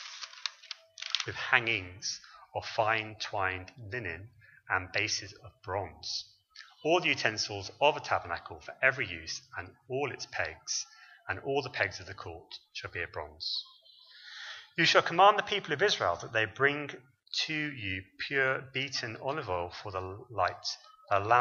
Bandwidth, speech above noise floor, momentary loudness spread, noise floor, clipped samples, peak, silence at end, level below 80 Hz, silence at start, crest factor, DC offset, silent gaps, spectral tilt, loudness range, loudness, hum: 7.4 kHz; 24 dB; 17 LU; -56 dBFS; under 0.1%; -8 dBFS; 0 s; -66 dBFS; 0 s; 26 dB; under 0.1%; none; -3 dB/octave; 8 LU; -31 LUFS; none